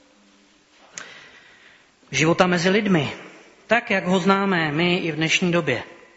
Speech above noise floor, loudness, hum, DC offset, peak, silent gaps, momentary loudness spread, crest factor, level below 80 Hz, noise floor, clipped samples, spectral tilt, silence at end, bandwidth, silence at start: 36 dB; -20 LUFS; none; under 0.1%; -2 dBFS; none; 20 LU; 22 dB; -58 dBFS; -56 dBFS; under 0.1%; -4 dB/octave; 0.25 s; 8 kHz; 0.95 s